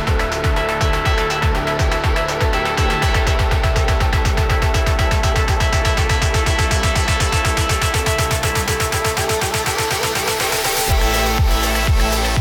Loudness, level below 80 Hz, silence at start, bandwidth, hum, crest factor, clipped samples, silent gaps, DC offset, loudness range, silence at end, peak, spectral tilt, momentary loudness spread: -17 LUFS; -20 dBFS; 0 s; over 20 kHz; none; 10 dB; under 0.1%; none; under 0.1%; 1 LU; 0 s; -6 dBFS; -4 dB/octave; 2 LU